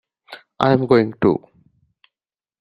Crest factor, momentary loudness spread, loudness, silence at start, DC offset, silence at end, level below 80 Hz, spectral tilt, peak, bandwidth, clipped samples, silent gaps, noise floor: 20 dB; 6 LU; -18 LUFS; 0.3 s; under 0.1%; 1.25 s; -56 dBFS; -8.5 dB/octave; 0 dBFS; 7 kHz; under 0.1%; none; under -90 dBFS